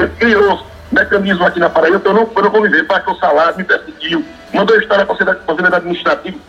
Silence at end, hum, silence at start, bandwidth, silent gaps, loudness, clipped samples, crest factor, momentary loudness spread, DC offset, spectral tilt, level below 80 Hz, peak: 0.1 s; none; 0 s; 8.2 kHz; none; -13 LUFS; under 0.1%; 12 dB; 6 LU; under 0.1%; -6 dB/octave; -42 dBFS; 0 dBFS